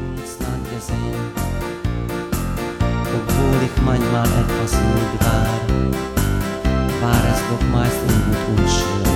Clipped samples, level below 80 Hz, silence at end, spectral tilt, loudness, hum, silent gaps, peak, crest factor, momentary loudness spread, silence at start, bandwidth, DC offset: under 0.1%; -26 dBFS; 0 s; -6 dB/octave; -20 LUFS; none; none; -2 dBFS; 16 dB; 7 LU; 0 s; 18 kHz; under 0.1%